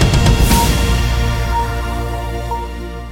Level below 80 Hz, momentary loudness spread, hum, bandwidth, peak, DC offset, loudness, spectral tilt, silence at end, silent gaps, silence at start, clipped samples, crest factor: -18 dBFS; 11 LU; none; 17.5 kHz; -2 dBFS; under 0.1%; -16 LUFS; -5 dB/octave; 0 s; none; 0 s; under 0.1%; 14 dB